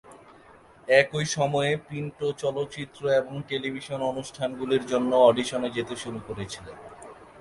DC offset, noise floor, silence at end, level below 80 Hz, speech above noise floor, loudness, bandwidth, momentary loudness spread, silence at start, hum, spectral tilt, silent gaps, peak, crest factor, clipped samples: under 0.1%; -53 dBFS; 0 s; -60 dBFS; 27 dB; -26 LUFS; 11.5 kHz; 18 LU; 0.1 s; none; -4.5 dB/octave; none; -4 dBFS; 22 dB; under 0.1%